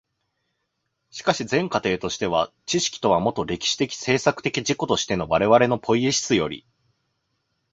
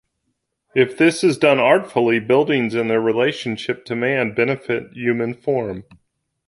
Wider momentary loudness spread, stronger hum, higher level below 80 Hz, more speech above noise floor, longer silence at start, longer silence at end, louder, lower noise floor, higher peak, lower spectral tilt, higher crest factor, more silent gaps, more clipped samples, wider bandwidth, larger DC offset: about the same, 7 LU vs 9 LU; neither; first, -52 dBFS vs -60 dBFS; about the same, 54 dB vs 55 dB; first, 1.15 s vs 0.75 s; first, 1.15 s vs 0.65 s; second, -22 LUFS vs -18 LUFS; about the same, -76 dBFS vs -73 dBFS; about the same, -2 dBFS vs -2 dBFS; second, -4 dB/octave vs -5.5 dB/octave; about the same, 22 dB vs 18 dB; neither; neither; second, 8 kHz vs 11.5 kHz; neither